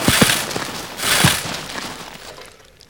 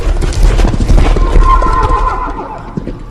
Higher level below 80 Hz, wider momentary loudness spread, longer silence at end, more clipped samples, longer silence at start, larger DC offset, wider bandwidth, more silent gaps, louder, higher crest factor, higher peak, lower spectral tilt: second, -42 dBFS vs -10 dBFS; first, 21 LU vs 12 LU; first, 0.4 s vs 0 s; second, under 0.1% vs 2%; about the same, 0 s vs 0 s; first, 0.2% vs under 0.1%; first, over 20 kHz vs 10.5 kHz; neither; second, -18 LUFS vs -13 LUFS; first, 20 dB vs 10 dB; about the same, 0 dBFS vs 0 dBFS; second, -2.5 dB/octave vs -6.5 dB/octave